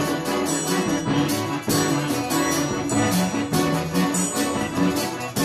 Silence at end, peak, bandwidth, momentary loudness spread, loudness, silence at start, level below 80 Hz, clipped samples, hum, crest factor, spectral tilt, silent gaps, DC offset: 0 s; -6 dBFS; 15.5 kHz; 2 LU; -22 LUFS; 0 s; -52 dBFS; under 0.1%; none; 16 dB; -4 dB/octave; none; under 0.1%